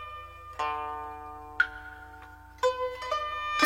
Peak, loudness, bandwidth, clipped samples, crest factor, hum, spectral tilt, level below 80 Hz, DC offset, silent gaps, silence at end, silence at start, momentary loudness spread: -10 dBFS; -32 LUFS; 16.5 kHz; under 0.1%; 22 dB; 60 Hz at -55 dBFS; -3 dB/octave; -54 dBFS; under 0.1%; none; 0 s; 0 s; 17 LU